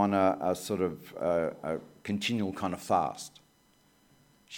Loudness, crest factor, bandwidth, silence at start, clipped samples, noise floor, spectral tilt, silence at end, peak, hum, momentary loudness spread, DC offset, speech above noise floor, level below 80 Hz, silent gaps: -31 LUFS; 20 dB; 17.5 kHz; 0 s; under 0.1%; -66 dBFS; -5.5 dB/octave; 0 s; -12 dBFS; none; 10 LU; under 0.1%; 35 dB; -66 dBFS; none